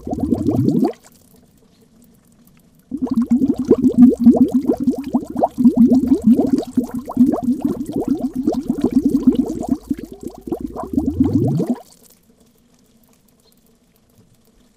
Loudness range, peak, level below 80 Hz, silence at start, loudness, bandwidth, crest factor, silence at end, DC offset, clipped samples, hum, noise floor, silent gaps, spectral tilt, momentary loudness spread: 9 LU; 0 dBFS; -42 dBFS; 0.05 s; -17 LUFS; 14.5 kHz; 18 dB; 2.95 s; under 0.1%; under 0.1%; none; -55 dBFS; none; -9 dB/octave; 14 LU